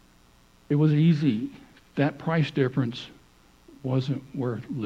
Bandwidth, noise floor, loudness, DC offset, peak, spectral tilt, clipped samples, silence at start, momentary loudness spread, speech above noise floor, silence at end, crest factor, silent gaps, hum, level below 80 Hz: 7.4 kHz; -57 dBFS; -26 LUFS; under 0.1%; -10 dBFS; -8.5 dB/octave; under 0.1%; 0.7 s; 16 LU; 33 dB; 0 s; 16 dB; none; none; -62 dBFS